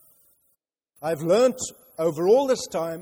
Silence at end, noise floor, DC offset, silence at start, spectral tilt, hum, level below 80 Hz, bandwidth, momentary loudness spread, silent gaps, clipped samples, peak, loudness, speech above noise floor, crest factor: 0 s; -73 dBFS; under 0.1%; 1 s; -4.5 dB/octave; none; -66 dBFS; over 20 kHz; 13 LU; none; under 0.1%; -8 dBFS; -23 LUFS; 50 dB; 16 dB